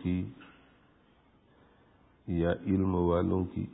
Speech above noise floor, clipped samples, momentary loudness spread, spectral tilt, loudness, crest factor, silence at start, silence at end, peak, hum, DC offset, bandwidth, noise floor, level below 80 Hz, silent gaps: 35 dB; under 0.1%; 10 LU; -12 dB/octave; -31 LUFS; 18 dB; 0 s; 0 s; -16 dBFS; none; under 0.1%; 4 kHz; -64 dBFS; -46 dBFS; none